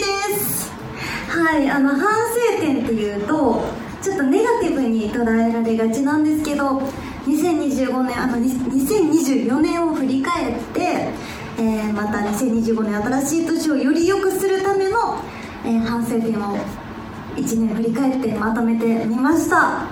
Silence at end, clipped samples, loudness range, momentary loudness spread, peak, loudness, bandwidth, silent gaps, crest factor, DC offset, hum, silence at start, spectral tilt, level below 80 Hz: 0 s; under 0.1%; 2 LU; 9 LU; -2 dBFS; -19 LUFS; 19.5 kHz; none; 16 dB; under 0.1%; none; 0 s; -5 dB/octave; -46 dBFS